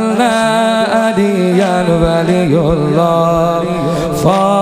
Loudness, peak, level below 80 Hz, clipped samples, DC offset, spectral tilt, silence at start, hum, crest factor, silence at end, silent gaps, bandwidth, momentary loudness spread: -12 LUFS; 0 dBFS; -34 dBFS; under 0.1%; under 0.1%; -6 dB/octave; 0 s; none; 12 dB; 0 s; none; 15.5 kHz; 3 LU